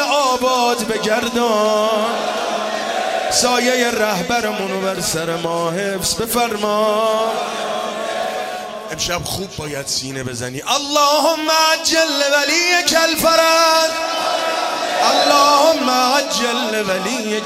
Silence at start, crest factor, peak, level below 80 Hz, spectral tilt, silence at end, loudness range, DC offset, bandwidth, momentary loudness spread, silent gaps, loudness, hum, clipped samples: 0 s; 14 dB; -2 dBFS; -50 dBFS; -2 dB/octave; 0 s; 6 LU; under 0.1%; 16 kHz; 9 LU; none; -16 LUFS; none; under 0.1%